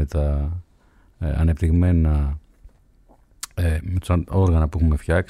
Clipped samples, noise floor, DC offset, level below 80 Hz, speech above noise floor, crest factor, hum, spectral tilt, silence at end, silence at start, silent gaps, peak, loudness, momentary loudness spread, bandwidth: under 0.1%; -55 dBFS; under 0.1%; -26 dBFS; 36 dB; 14 dB; none; -8 dB/octave; 0.05 s; 0 s; none; -6 dBFS; -21 LUFS; 13 LU; 13.5 kHz